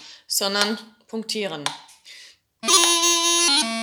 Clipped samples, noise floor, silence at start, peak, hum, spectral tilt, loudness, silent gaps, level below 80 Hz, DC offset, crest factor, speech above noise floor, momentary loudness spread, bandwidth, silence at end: under 0.1%; -48 dBFS; 0 s; 0 dBFS; none; 0 dB/octave; -19 LUFS; none; -80 dBFS; under 0.1%; 22 dB; 23 dB; 17 LU; over 20 kHz; 0 s